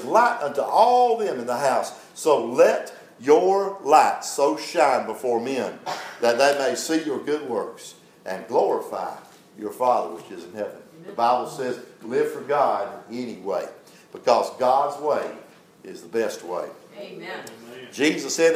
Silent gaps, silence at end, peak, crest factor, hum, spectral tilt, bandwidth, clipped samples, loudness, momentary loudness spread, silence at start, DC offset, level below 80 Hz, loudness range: none; 0 s; -2 dBFS; 20 dB; none; -3.5 dB/octave; 16 kHz; under 0.1%; -23 LUFS; 19 LU; 0 s; under 0.1%; -80 dBFS; 7 LU